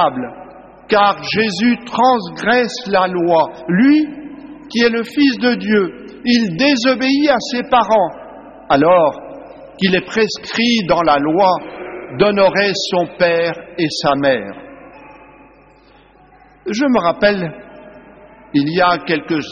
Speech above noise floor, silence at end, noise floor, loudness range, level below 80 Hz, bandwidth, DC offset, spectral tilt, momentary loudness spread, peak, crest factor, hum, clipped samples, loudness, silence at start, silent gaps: 32 dB; 0 s; -47 dBFS; 6 LU; -50 dBFS; 7.4 kHz; under 0.1%; -3 dB/octave; 15 LU; -2 dBFS; 14 dB; none; under 0.1%; -15 LUFS; 0 s; none